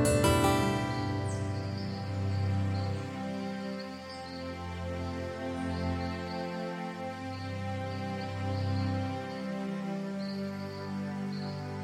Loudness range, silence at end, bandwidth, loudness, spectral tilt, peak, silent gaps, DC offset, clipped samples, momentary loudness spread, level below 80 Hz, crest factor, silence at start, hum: 4 LU; 0 s; 16 kHz; -34 LUFS; -6 dB/octave; -12 dBFS; none; under 0.1%; under 0.1%; 9 LU; -52 dBFS; 22 dB; 0 s; none